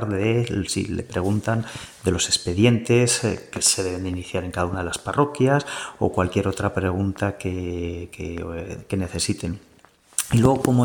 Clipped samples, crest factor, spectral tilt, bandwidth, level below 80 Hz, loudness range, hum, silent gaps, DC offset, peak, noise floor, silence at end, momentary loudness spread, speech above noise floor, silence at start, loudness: under 0.1%; 20 dB; -4.5 dB/octave; 19 kHz; -46 dBFS; 6 LU; none; none; under 0.1%; -2 dBFS; -54 dBFS; 0 s; 12 LU; 31 dB; 0 s; -23 LUFS